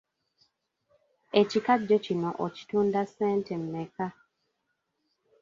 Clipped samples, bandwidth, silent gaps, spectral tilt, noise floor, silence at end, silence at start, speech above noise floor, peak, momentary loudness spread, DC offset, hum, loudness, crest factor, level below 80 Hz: under 0.1%; 7.4 kHz; none; -6.5 dB/octave; -79 dBFS; 1.3 s; 1.35 s; 52 dB; -8 dBFS; 11 LU; under 0.1%; none; -28 LUFS; 22 dB; -72 dBFS